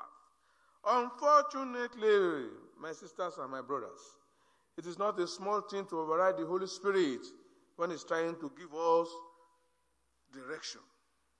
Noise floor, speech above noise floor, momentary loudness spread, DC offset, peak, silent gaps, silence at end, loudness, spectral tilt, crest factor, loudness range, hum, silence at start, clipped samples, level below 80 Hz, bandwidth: -78 dBFS; 44 dB; 18 LU; under 0.1%; -14 dBFS; none; 0.6 s; -34 LUFS; -4.5 dB/octave; 22 dB; 6 LU; none; 0 s; under 0.1%; -88 dBFS; 10.5 kHz